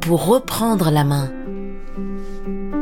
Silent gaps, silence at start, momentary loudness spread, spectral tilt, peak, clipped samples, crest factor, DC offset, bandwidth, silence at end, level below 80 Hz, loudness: none; 0 s; 15 LU; -6 dB/octave; -4 dBFS; under 0.1%; 16 dB; under 0.1%; 18.5 kHz; 0 s; -32 dBFS; -20 LUFS